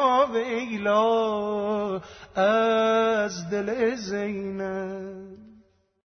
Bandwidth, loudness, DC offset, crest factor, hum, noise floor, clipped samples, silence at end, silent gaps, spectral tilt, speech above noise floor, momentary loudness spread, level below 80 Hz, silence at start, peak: 6.6 kHz; -25 LUFS; under 0.1%; 16 dB; none; -58 dBFS; under 0.1%; 0.55 s; none; -5 dB/octave; 34 dB; 13 LU; -62 dBFS; 0 s; -10 dBFS